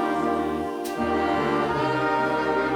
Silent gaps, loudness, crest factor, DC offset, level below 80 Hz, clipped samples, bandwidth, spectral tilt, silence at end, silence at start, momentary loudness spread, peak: none; -24 LUFS; 12 dB; under 0.1%; -50 dBFS; under 0.1%; over 20 kHz; -6 dB/octave; 0 s; 0 s; 5 LU; -12 dBFS